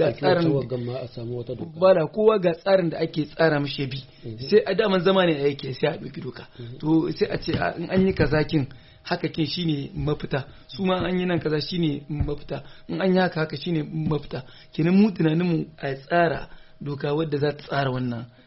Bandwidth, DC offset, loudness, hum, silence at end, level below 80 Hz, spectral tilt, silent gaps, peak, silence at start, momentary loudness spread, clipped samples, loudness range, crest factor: 6 kHz; under 0.1%; -24 LUFS; none; 0.2 s; -46 dBFS; -5.5 dB/octave; none; -6 dBFS; 0 s; 14 LU; under 0.1%; 4 LU; 18 dB